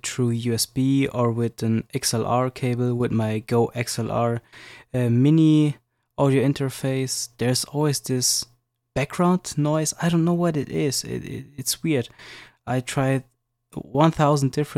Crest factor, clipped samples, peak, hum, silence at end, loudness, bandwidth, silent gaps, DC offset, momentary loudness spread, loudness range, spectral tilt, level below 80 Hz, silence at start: 16 dB; under 0.1%; -6 dBFS; none; 0 s; -23 LUFS; 16 kHz; none; under 0.1%; 12 LU; 3 LU; -5.5 dB/octave; -54 dBFS; 0.05 s